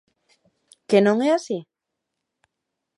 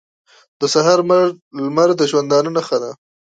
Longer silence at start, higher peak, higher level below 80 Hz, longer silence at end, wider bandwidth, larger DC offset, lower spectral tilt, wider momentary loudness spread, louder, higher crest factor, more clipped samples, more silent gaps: first, 0.9 s vs 0.6 s; about the same, -4 dBFS vs -2 dBFS; second, -78 dBFS vs -68 dBFS; first, 1.35 s vs 0.4 s; first, 11.5 kHz vs 9.2 kHz; neither; first, -6 dB/octave vs -4.5 dB/octave; first, 14 LU vs 9 LU; second, -21 LUFS vs -16 LUFS; about the same, 20 dB vs 16 dB; neither; second, none vs 1.42-1.51 s